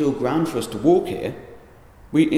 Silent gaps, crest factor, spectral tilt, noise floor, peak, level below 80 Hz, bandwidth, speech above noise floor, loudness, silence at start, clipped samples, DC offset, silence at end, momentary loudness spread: none; 16 dB; -6.5 dB/octave; -47 dBFS; -4 dBFS; -50 dBFS; 15 kHz; 27 dB; -22 LUFS; 0 s; under 0.1%; under 0.1%; 0 s; 12 LU